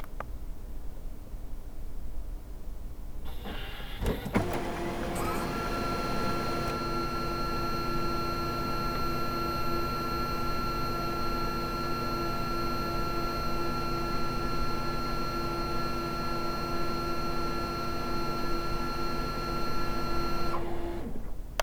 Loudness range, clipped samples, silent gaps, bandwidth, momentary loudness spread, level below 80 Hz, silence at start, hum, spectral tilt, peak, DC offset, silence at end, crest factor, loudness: 5 LU; under 0.1%; none; over 20 kHz; 13 LU; -38 dBFS; 0 s; none; -5.5 dB/octave; -8 dBFS; under 0.1%; 0 s; 22 dB; -33 LUFS